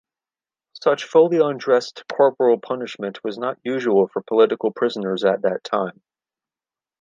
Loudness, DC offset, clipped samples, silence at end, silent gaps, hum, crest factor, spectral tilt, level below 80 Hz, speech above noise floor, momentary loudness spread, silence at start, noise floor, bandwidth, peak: -20 LUFS; under 0.1%; under 0.1%; 1.1 s; none; none; 18 dB; -6 dB/octave; -76 dBFS; over 71 dB; 11 LU; 0.75 s; under -90 dBFS; 7.6 kHz; -2 dBFS